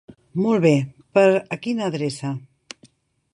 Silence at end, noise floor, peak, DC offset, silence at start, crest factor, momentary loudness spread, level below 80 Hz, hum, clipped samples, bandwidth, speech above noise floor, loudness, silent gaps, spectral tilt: 0.95 s; -56 dBFS; -4 dBFS; under 0.1%; 0.1 s; 18 dB; 25 LU; -64 dBFS; none; under 0.1%; 11 kHz; 37 dB; -21 LUFS; none; -6.5 dB/octave